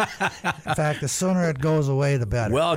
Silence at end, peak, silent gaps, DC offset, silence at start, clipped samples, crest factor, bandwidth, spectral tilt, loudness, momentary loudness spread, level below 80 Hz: 0 s; -10 dBFS; none; under 0.1%; 0 s; under 0.1%; 12 dB; 16 kHz; -5.5 dB/octave; -23 LUFS; 4 LU; -44 dBFS